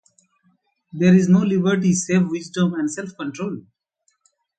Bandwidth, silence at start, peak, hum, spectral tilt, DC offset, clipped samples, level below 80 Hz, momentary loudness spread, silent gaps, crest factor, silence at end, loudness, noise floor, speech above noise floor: 9.2 kHz; 0.95 s; -4 dBFS; none; -6.5 dB/octave; under 0.1%; under 0.1%; -62 dBFS; 15 LU; none; 18 dB; 1 s; -19 LUFS; -69 dBFS; 50 dB